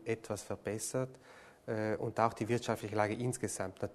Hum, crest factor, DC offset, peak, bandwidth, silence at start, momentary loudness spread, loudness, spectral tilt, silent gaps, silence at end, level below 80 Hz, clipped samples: none; 22 dB; under 0.1%; -14 dBFS; 13 kHz; 0 s; 9 LU; -37 LUFS; -5 dB/octave; none; 0 s; -68 dBFS; under 0.1%